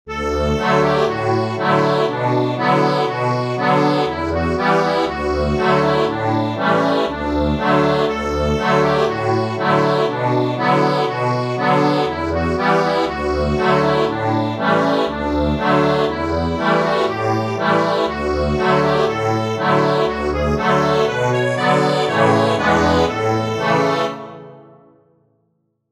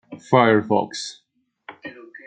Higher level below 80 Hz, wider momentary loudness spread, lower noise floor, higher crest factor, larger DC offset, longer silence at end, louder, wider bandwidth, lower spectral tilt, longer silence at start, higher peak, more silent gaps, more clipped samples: first, -34 dBFS vs -68 dBFS; second, 4 LU vs 22 LU; first, -67 dBFS vs -46 dBFS; about the same, 16 dB vs 20 dB; neither; first, 1.3 s vs 0.1 s; about the same, -17 LUFS vs -19 LUFS; first, 13.5 kHz vs 9.4 kHz; about the same, -6.5 dB/octave vs -5.5 dB/octave; about the same, 0.05 s vs 0.1 s; about the same, -2 dBFS vs -2 dBFS; neither; neither